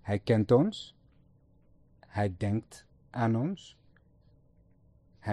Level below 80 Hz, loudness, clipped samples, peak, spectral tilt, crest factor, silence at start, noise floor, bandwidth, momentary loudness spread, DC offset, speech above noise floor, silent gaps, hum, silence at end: -62 dBFS; -30 LUFS; under 0.1%; -12 dBFS; -8 dB/octave; 20 dB; 0.05 s; -63 dBFS; 11.5 kHz; 18 LU; under 0.1%; 34 dB; none; none; 0 s